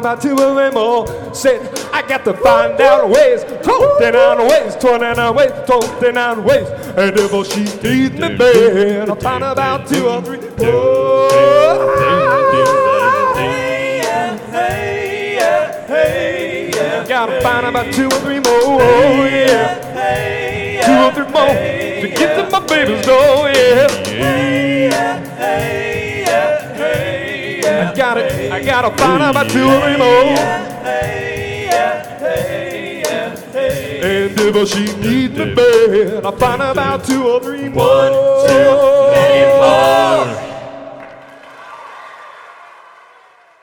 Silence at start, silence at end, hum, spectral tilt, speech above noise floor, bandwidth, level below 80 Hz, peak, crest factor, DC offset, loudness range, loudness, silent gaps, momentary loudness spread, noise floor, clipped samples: 0 s; 0.95 s; none; -4.5 dB/octave; 34 dB; 19 kHz; -42 dBFS; 0 dBFS; 12 dB; under 0.1%; 5 LU; -13 LUFS; none; 10 LU; -46 dBFS; under 0.1%